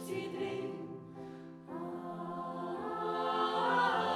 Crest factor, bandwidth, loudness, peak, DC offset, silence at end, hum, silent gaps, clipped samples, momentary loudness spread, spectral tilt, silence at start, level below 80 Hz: 18 dB; 15 kHz; -36 LUFS; -18 dBFS; under 0.1%; 0 s; none; none; under 0.1%; 17 LU; -5 dB/octave; 0 s; -78 dBFS